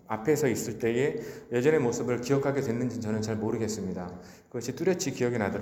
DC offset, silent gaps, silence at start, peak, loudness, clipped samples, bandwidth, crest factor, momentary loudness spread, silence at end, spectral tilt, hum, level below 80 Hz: under 0.1%; none; 0.1 s; -10 dBFS; -29 LUFS; under 0.1%; 17 kHz; 18 dB; 11 LU; 0 s; -5.5 dB/octave; none; -62 dBFS